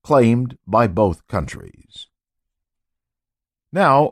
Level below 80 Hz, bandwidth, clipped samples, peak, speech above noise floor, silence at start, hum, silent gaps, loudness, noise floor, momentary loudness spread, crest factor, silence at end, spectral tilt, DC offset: -44 dBFS; 13 kHz; under 0.1%; -4 dBFS; 69 dB; 0.1 s; none; none; -18 LUFS; -86 dBFS; 24 LU; 16 dB; 0 s; -7.5 dB/octave; under 0.1%